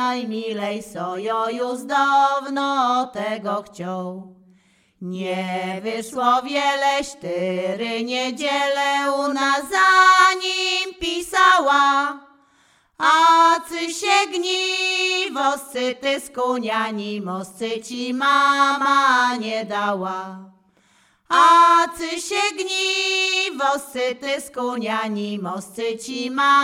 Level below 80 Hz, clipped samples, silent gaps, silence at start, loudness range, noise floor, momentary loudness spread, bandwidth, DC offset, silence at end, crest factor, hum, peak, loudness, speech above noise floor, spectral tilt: -62 dBFS; under 0.1%; none; 0 s; 7 LU; -59 dBFS; 13 LU; 16 kHz; under 0.1%; 0 s; 20 dB; none; 0 dBFS; -19 LUFS; 39 dB; -2.5 dB/octave